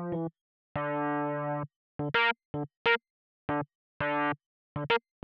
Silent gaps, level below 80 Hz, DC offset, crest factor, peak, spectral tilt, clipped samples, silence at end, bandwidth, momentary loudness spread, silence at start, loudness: 0.41-0.75 s, 1.76-1.99 s, 2.45-2.54 s, 2.77-2.85 s, 3.10-3.48 s, 3.75-4.00 s, 4.46-4.76 s; -64 dBFS; under 0.1%; 20 dB; -12 dBFS; -7.5 dB/octave; under 0.1%; 0.25 s; 6.6 kHz; 13 LU; 0 s; -32 LUFS